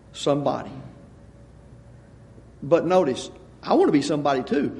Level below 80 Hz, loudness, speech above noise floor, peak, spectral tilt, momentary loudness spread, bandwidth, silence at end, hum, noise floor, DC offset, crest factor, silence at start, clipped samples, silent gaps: -54 dBFS; -22 LUFS; 26 dB; -4 dBFS; -6 dB/octave; 20 LU; 11.5 kHz; 0 s; none; -47 dBFS; under 0.1%; 20 dB; 0.15 s; under 0.1%; none